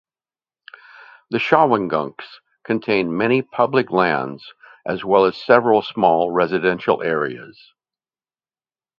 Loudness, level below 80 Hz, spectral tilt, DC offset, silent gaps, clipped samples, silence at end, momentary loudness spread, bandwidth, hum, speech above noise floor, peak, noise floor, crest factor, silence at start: -18 LUFS; -62 dBFS; -7.5 dB/octave; under 0.1%; none; under 0.1%; 1.5 s; 15 LU; 6.8 kHz; none; over 72 dB; 0 dBFS; under -90 dBFS; 20 dB; 1.3 s